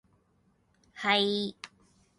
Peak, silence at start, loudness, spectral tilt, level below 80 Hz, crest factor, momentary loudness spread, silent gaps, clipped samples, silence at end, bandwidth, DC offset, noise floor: -12 dBFS; 0.95 s; -28 LUFS; -4 dB/octave; -74 dBFS; 22 dB; 22 LU; none; under 0.1%; 0.5 s; 11.5 kHz; under 0.1%; -69 dBFS